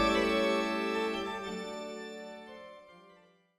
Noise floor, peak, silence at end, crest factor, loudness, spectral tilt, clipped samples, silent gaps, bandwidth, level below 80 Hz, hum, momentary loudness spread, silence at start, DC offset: -62 dBFS; -16 dBFS; 0.45 s; 18 dB; -33 LUFS; -4 dB/octave; under 0.1%; none; 15 kHz; -56 dBFS; none; 21 LU; 0 s; under 0.1%